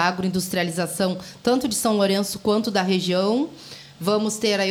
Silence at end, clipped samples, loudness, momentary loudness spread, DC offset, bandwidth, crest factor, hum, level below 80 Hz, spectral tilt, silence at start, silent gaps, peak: 0 s; under 0.1%; -22 LUFS; 6 LU; under 0.1%; 19 kHz; 16 dB; none; -60 dBFS; -4.5 dB/octave; 0 s; none; -6 dBFS